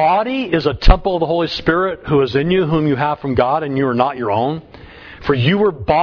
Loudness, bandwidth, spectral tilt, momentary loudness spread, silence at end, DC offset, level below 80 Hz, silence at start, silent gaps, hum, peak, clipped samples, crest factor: -17 LUFS; 5.4 kHz; -8 dB/octave; 4 LU; 0 s; under 0.1%; -24 dBFS; 0 s; none; none; 0 dBFS; under 0.1%; 16 dB